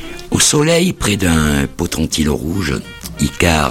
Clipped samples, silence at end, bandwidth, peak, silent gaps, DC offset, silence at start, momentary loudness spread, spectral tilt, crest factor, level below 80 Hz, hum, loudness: under 0.1%; 0 s; 17 kHz; 0 dBFS; none; under 0.1%; 0 s; 9 LU; -4 dB/octave; 16 dB; -30 dBFS; none; -15 LUFS